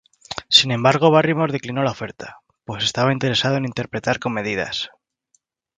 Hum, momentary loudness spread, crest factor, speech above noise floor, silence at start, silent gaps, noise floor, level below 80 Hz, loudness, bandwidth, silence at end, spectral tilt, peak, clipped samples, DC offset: none; 18 LU; 20 dB; 47 dB; 0.3 s; none; -66 dBFS; -56 dBFS; -19 LUFS; 9.6 kHz; 0.9 s; -4.5 dB/octave; 0 dBFS; under 0.1%; under 0.1%